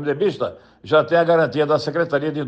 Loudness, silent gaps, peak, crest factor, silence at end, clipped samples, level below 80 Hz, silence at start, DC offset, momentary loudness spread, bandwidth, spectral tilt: -19 LUFS; none; -4 dBFS; 14 dB; 0 s; under 0.1%; -62 dBFS; 0 s; under 0.1%; 7 LU; 8.4 kHz; -7 dB/octave